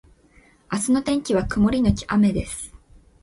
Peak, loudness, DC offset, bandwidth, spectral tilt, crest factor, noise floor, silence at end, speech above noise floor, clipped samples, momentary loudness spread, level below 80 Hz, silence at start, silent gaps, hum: -4 dBFS; -21 LUFS; under 0.1%; 11.5 kHz; -5.5 dB/octave; 20 dB; -55 dBFS; 0.55 s; 34 dB; under 0.1%; 13 LU; -38 dBFS; 0.7 s; none; none